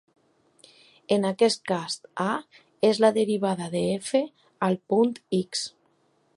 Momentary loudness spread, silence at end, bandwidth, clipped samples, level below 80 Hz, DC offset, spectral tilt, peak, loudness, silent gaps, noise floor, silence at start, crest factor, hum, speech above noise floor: 9 LU; 0.65 s; 11.5 kHz; under 0.1%; -70 dBFS; under 0.1%; -5 dB/octave; -6 dBFS; -25 LUFS; none; -67 dBFS; 1.1 s; 20 dB; none; 42 dB